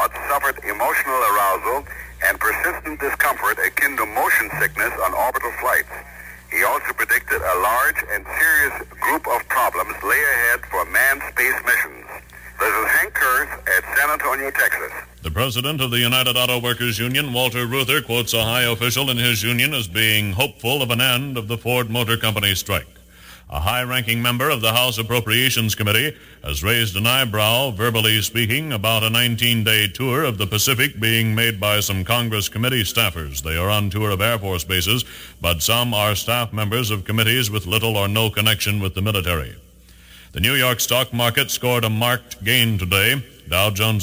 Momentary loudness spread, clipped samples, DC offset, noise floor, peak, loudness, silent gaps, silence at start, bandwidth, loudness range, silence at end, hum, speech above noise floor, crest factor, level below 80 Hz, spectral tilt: 7 LU; under 0.1%; under 0.1%; -46 dBFS; 0 dBFS; -18 LUFS; none; 0 s; 20 kHz; 2 LU; 0 s; 60 Hz at -45 dBFS; 26 dB; 20 dB; -42 dBFS; -3 dB/octave